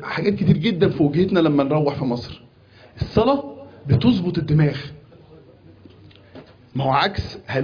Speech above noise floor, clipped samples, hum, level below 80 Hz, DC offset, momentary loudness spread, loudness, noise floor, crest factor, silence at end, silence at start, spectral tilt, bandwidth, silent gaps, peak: 30 dB; under 0.1%; none; -44 dBFS; under 0.1%; 14 LU; -20 LUFS; -49 dBFS; 18 dB; 0 s; 0 s; -8.5 dB/octave; 5.2 kHz; none; -4 dBFS